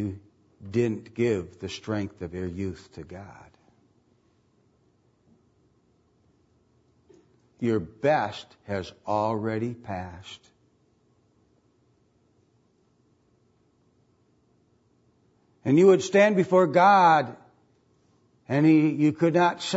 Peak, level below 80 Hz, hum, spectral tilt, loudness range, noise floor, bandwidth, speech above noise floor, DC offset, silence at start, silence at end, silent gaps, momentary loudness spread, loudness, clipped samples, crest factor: -8 dBFS; -64 dBFS; none; -6.5 dB/octave; 18 LU; -66 dBFS; 8 kHz; 42 dB; under 0.1%; 0 s; 0 s; none; 23 LU; -24 LUFS; under 0.1%; 20 dB